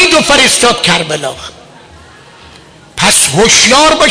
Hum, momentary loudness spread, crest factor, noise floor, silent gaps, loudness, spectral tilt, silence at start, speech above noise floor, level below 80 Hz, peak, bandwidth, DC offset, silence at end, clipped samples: none; 18 LU; 10 dB; -37 dBFS; none; -6 LUFS; -1.5 dB/octave; 0 s; 28 dB; -36 dBFS; 0 dBFS; 11 kHz; under 0.1%; 0 s; 0.2%